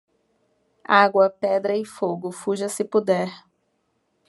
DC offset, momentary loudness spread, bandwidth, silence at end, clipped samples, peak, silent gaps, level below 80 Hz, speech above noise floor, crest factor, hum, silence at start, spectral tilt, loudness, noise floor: under 0.1%; 11 LU; 12 kHz; 0.9 s; under 0.1%; -2 dBFS; none; -76 dBFS; 49 dB; 22 dB; none; 0.9 s; -4.5 dB/octave; -22 LUFS; -71 dBFS